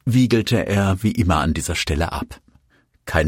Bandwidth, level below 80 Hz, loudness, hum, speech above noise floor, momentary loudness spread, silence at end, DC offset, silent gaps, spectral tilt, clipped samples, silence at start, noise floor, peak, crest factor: 16.5 kHz; -36 dBFS; -20 LUFS; none; 41 dB; 11 LU; 0 s; under 0.1%; none; -5.5 dB/octave; under 0.1%; 0.05 s; -60 dBFS; -4 dBFS; 16 dB